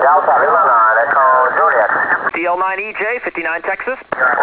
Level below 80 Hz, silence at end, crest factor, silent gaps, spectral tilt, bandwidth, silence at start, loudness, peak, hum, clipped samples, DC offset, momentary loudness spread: -58 dBFS; 0 s; 12 dB; none; -7 dB/octave; 4 kHz; 0 s; -13 LUFS; -2 dBFS; none; under 0.1%; under 0.1%; 8 LU